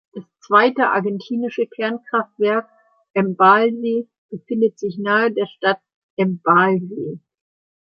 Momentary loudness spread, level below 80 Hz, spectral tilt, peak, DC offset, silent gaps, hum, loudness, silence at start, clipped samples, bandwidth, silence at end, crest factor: 15 LU; -72 dBFS; -7.5 dB/octave; -2 dBFS; under 0.1%; 3.10-3.14 s, 4.18-4.29 s, 5.94-6.17 s; none; -19 LUFS; 0.15 s; under 0.1%; 7 kHz; 0.65 s; 18 dB